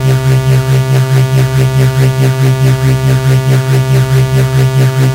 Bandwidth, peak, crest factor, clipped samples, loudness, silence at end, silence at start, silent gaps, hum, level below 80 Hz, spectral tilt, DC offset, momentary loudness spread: 16 kHz; 0 dBFS; 8 dB; under 0.1%; -10 LUFS; 0 s; 0 s; none; none; -30 dBFS; -6.5 dB/octave; under 0.1%; 1 LU